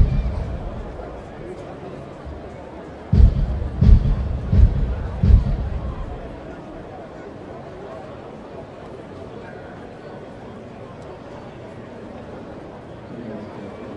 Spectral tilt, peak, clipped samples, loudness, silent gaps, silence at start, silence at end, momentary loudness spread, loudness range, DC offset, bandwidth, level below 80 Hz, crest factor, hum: -9.5 dB/octave; 0 dBFS; under 0.1%; -22 LUFS; none; 0 s; 0 s; 20 LU; 17 LU; under 0.1%; 5.6 kHz; -24 dBFS; 22 dB; none